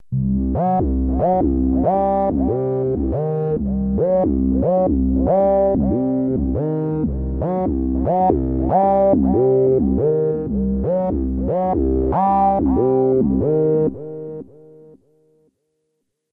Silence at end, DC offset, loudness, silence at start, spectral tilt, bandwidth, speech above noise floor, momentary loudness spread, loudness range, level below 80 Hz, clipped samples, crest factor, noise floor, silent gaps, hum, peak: 1.9 s; under 0.1%; -18 LUFS; 0 s; -13.5 dB/octave; 3.5 kHz; 56 dB; 6 LU; 2 LU; -28 dBFS; under 0.1%; 16 dB; -73 dBFS; none; none; -2 dBFS